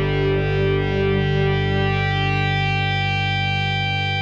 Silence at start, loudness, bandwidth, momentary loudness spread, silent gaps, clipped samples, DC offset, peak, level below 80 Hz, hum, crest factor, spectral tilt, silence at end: 0 s; -20 LUFS; 7.2 kHz; 1 LU; none; under 0.1%; under 0.1%; -8 dBFS; -34 dBFS; 50 Hz at -60 dBFS; 12 dB; -7 dB/octave; 0 s